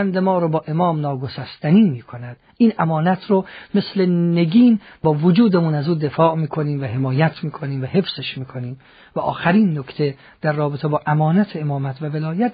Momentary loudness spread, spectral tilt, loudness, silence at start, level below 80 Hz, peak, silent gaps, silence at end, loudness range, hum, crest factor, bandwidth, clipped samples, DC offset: 12 LU; -6.5 dB/octave; -19 LUFS; 0 s; -58 dBFS; -2 dBFS; none; 0 s; 5 LU; none; 16 dB; 5 kHz; under 0.1%; under 0.1%